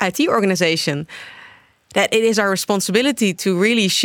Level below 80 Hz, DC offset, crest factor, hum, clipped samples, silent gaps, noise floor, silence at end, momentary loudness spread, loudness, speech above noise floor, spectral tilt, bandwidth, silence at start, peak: -64 dBFS; under 0.1%; 16 dB; none; under 0.1%; none; -47 dBFS; 0 s; 10 LU; -17 LUFS; 29 dB; -3.5 dB/octave; 19.5 kHz; 0 s; -2 dBFS